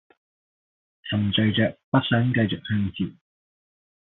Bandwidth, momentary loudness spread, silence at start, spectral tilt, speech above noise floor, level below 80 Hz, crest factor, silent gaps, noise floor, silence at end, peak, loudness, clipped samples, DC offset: 4.1 kHz; 10 LU; 1.05 s; -5 dB/octave; over 67 dB; -60 dBFS; 20 dB; 1.84-1.92 s; under -90 dBFS; 1.05 s; -6 dBFS; -24 LUFS; under 0.1%; under 0.1%